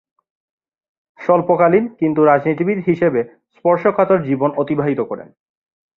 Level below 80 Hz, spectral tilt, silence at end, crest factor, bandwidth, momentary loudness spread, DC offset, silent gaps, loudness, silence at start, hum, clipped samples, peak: -60 dBFS; -10.5 dB/octave; 0.75 s; 16 dB; 5.2 kHz; 9 LU; under 0.1%; none; -16 LUFS; 1.2 s; none; under 0.1%; -2 dBFS